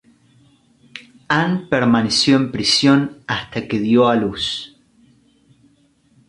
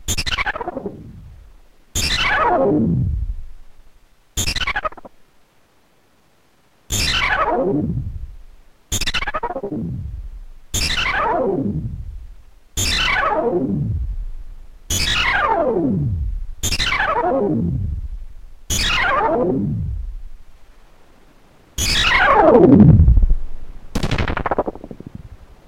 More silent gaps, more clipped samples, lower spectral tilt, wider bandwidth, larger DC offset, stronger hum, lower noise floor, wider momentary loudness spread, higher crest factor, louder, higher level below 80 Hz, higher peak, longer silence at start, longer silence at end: neither; neither; about the same, -4.5 dB/octave vs -4.5 dB/octave; second, 11.5 kHz vs 16 kHz; neither; neither; about the same, -57 dBFS vs -58 dBFS; first, 24 LU vs 19 LU; about the same, 16 dB vs 18 dB; about the same, -17 LUFS vs -18 LUFS; second, -52 dBFS vs -26 dBFS; about the same, -2 dBFS vs 0 dBFS; first, 0.95 s vs 0 s; first, 1.65 s vs 0.25 s